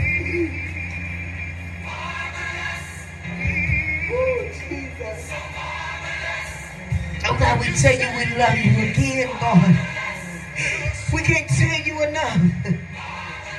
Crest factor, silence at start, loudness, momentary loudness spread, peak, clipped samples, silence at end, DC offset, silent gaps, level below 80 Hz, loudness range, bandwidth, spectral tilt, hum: 20 dB; 0 s; -22 LUFS; 14 LU; -2 dBFS; under 0.1%; 0 s; under 0.1%; none; -36 dBFS; 8 LU; 12 kHz; -5.5 dB/octave; none